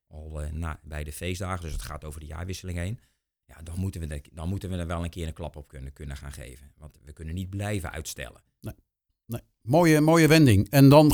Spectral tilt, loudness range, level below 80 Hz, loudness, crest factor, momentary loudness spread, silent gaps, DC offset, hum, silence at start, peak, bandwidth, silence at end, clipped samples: -6.5 dB/octave; 14 LU; -42 dBFS; -24 LUFS; 22 dB; 24 LU; none; under 0.1%; none; 0.15 s; -2 dBFS; 20 kHz; 0 s; under 0.1%